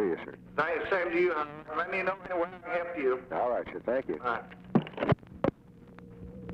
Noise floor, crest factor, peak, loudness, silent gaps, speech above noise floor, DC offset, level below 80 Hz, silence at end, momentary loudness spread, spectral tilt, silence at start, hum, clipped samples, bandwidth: -53 dBFS; 20 dB; -12 dBFS; -32 LUFS; none; 21 dB; under 0.1%; -60 dBFS; 0 s; 8 LU; -8.5 dB/octave; 0 s; none; under 0.1%; 6.8 kHz